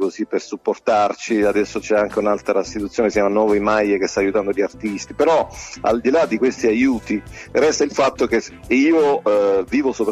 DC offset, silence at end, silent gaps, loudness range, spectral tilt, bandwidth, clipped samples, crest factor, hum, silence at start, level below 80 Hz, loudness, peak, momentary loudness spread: under 0.1%; 0 s; none; 1 LU; -4.5 dB/octave; 12.5 kHz; under 0.1%; 14 dB; none; 0 s; -46 dBFS; -18 LUFS; -4 dBFS; 7 LU